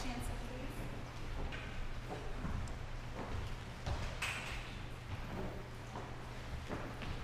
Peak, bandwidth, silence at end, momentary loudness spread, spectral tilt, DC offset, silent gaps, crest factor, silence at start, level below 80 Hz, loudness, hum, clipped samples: -26 dBFS; 15.5 kHz; 0 s; 6 LU; -5 dB/octave; under 0.1%; none; 16 dB; 0 s; -46 dBFS; -45 LUFS; none; under 0.1%